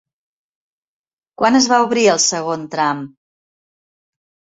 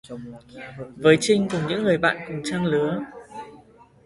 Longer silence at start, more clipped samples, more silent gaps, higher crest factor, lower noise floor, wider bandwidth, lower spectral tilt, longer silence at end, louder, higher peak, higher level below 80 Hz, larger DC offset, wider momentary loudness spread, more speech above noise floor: first, 1.4 s vs 0.05 s; neither; neither; about the same, 18 dB vs 22 dB; first, under -90 dBFS vs -51 dBFS; second, 8.4 kHz vs 11.5 kHz; second, -2.5 dB/octave vs -5 dB/octave; first, 1.45 s vs 0.5 s; first, -15 LUFS vs -22 LUFS; about the same, -2 dBFS vs -2 dBFS; second, -64 dBFS vs -58 dBFS; neither; second, 10 LU vs 22 LU; first, over 75 dB vs 29 dB